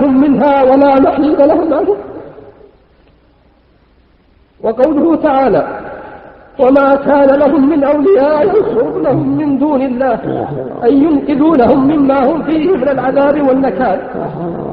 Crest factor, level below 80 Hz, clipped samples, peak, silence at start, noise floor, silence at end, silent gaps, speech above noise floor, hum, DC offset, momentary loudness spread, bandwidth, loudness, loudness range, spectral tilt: 12 dB; -42 dBFS; under 0.1%; 0 dBFS; 0 s; -49 dBFS; 0 s; none; 38 dB; none; under 0.1%; 12 LU; 4.9 kHz; -11 LUFS; 6 LU; -10.5 dB/octave